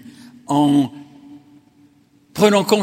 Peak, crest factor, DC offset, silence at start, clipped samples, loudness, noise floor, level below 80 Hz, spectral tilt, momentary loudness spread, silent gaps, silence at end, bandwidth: 0 dBFS; 20 dB; under 0.1%; 0.05 s; under 0.1%; -17 LUFS; -54 dBFS; -60 dBFS; -5.5 dB/octave; 11 LU; none; 0 s; 16.5 kHz